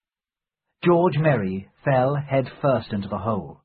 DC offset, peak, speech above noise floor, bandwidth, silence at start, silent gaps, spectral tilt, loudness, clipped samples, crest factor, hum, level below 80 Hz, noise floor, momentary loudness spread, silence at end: under 0.1%; -6 dBFS; over 68 dB; 4.8 kHz; 0.8 s; none; -12.5 dB/octave; -23 LUFS; under 0.1%; 18 dB; none; -52 dBFS; under -90 dBFS; 9 LU; 0.1 s